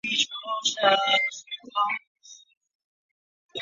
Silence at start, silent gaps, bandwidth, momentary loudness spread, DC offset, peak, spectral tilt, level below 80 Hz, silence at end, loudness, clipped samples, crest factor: 0.05 s; 2.07-2.15 s, 2.57-2.61 s, 2.75-3.49 s; 7.8 kHz; 12 LU; under 0.1%; -6 dBFS; 0 dB/octave; -80 dBFS; 0 s; -24 LUFS; under 0.1%; 22 dB